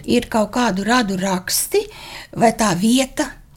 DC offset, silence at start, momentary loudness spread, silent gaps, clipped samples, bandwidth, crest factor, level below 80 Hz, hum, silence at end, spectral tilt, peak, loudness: under 0.1%; 0 s; 9 LU; none; under 0.1%; 17 kHz; 18 dB; -44 dBFS; none; 0.2 s; -4 dB/octave; -2 dBFS; -18 LUFS